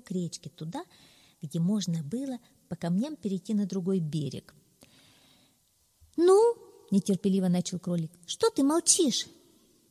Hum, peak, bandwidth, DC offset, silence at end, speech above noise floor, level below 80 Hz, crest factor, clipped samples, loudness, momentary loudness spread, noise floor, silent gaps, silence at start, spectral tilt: none; -8 dBFS; 15 kHz; under 0.1%; 0.65 s; 39 dB; -70 dBFS; 22 dB; under 0.1%; -28 LUFS; 17 LU; -69 dBFS; none; 0.1 s; -5 dB/octave